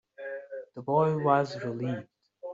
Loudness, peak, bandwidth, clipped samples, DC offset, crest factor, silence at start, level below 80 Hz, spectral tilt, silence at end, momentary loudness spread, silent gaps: -29 LUFS; -10 dBFS; 7.8 kHz; under 0.1%; under 0.1%; 20 dB; 0.2 s; -72 dBFS; -6.5 dB/octave; 0 s; 15 LU; none